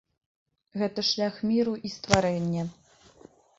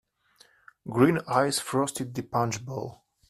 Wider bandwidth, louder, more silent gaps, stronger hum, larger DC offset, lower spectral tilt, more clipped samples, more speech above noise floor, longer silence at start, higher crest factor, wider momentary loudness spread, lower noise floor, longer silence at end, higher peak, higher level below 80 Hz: second, 8.2 kHz vs 15 kHz; about the same, -27 LUFS vs -27 LUFS; neither; neither; neither; about the same, -5 dB/octave vs -5 dB/octave; neither; second, 28 dB vs 35 dB; about the same, 0.75 s vs 0.85 s; first, 28 dB vs 20 dB; second, 10 LU vs 14 LU; second, -55 dBFS vs -61 dBFS; first, 0.85 s vs 0.4 s; first, -2 dBFS vs -8 dBFS; first, -54 dBFS vs -64 dBFS